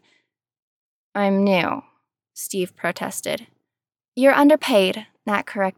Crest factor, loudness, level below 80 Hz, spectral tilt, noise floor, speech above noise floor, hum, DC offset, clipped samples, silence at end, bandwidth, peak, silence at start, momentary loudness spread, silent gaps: 18 dB; -20 LUFS; -74 dBFS; -4.5 dB/octave; -90 dBFS; 70 dB; none; under 0.1%; under 0.1%; 0.05 s; 17.5 kHz; -4 dBFS; 1.15 s; 16 LU; 4.08-4.12 s